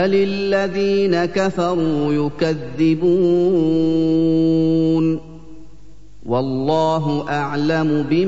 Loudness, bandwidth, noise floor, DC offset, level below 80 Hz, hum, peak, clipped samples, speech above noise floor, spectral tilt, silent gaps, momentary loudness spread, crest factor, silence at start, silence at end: -18 LUFS; 7.8 kHz; -45 dBFS; 2%; -48 dBFS; 50 Hz at -45 dBFS; -6 dBFS; under 0.1%; 28 dB; -7.5 dB/octave; none; 6 LU; 12 dB; 0 s; 0 s